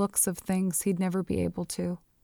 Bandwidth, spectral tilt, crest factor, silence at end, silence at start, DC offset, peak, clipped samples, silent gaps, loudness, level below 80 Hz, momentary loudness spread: 19.5 kHz; -5 dB/octave; 18 dB; 0.25 s; 0 s; under 0.1%; -12 dBFS; under 0.1%; none; -29 LUFS; -56 dBFS; 6 LU